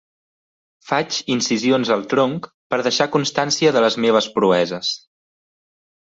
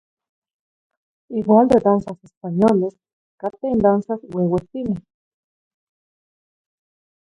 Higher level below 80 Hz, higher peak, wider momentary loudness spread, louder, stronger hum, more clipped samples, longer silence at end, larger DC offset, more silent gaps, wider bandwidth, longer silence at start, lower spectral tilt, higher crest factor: second, -64 dBFS vs -52 dBFS; about the same, -2 dBFS vs -2 dBFS; second, 8 LU vs 15 LU; about the same, -18 LUFS vs -19 LUFS; neither; neither; second, 1.15 s vs 2.3 s; neither; second, 2.54-2.70 s vs 2.37-2.41 s, 3.13-3.38 s; second, 8 kHz vs 10.5 kHz; second, 0.85 s vs 1.3 s; second, -4 dB/octave vs -9.5 dB/octave; about the same, 18 dB vs 20 dB